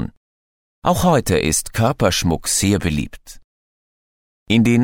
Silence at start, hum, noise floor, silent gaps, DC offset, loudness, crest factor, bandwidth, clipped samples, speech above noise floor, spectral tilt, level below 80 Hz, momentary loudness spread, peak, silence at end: 0 s; none; under -90 dBFS; 0.17-0.82 s, 3.44-4.46 s; under 0.1%; -18 LUFS; 18 dB; 17.5 kHz; under 0.1%; over 73 dB; -4.5 dB/octave; -36 dBFS; 8 LU; 0 dBFS; 0 s